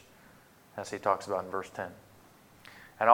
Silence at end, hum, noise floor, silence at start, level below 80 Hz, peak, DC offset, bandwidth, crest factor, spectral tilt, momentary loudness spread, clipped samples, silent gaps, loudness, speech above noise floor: 0 s; none; -58 dBFS; 0.75 s; -72 dBFS; -6 dBFS; under 0.1%; 19 kHz; 28 dB; -4.5 dB/octave; 24 LU; under 0.1%; none; -34 LUFS; 24 dB